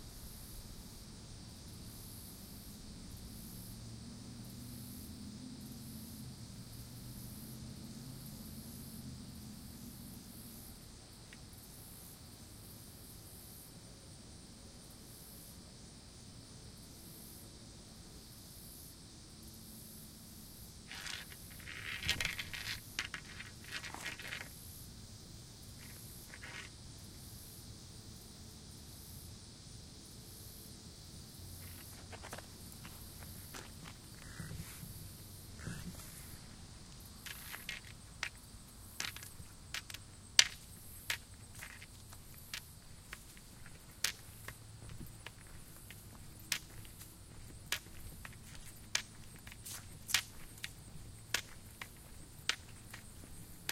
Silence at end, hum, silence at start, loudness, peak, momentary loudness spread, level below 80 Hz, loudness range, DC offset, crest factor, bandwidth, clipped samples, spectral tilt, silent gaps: 0 s; none; 0 s; -46 LUFS; -4 dBFS; 13 LU; -60 dBFS; 15 LU; under 0.1%; 42 dB; 16 kHz; under 0.1%; -2 dB/octave; none